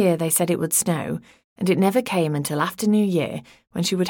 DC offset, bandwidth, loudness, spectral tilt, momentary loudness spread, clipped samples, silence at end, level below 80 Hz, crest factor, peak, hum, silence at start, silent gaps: under 0.1%; over 20 kHz; -22 LUFS; -4.5 dB/octave; 11 LU; under 0.1%; 0 s; -62 dBFS; 16 dB; -6 dBFS; none; 0 s; 1.44-1.56 s